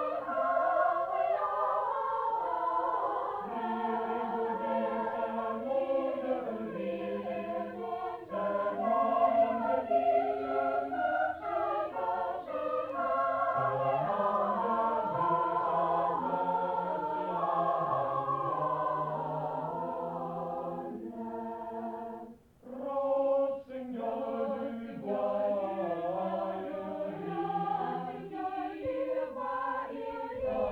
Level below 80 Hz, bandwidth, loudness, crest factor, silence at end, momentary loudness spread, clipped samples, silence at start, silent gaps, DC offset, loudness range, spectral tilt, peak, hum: -68 dBFS; 5.6 kHz; -33 LUFS; 18 dB; 0 s; 9 LU; under 0.1%; 0 s; none; under 0.1%; 5 LU; -8 dB/octave; -14 dBFS; none